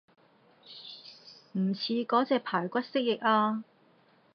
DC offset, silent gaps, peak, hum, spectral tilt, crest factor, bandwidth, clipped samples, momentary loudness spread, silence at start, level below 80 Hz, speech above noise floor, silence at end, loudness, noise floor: under 0.1%; none; -12 dBFS; none; -7.5 dB/octave; 20 dB; 6.4 kHz; under 0.1%; 20 LU; 0.7 s; -88 dBFS; 35 dB; 0.7 s; -29 LUFS; -64 dBFS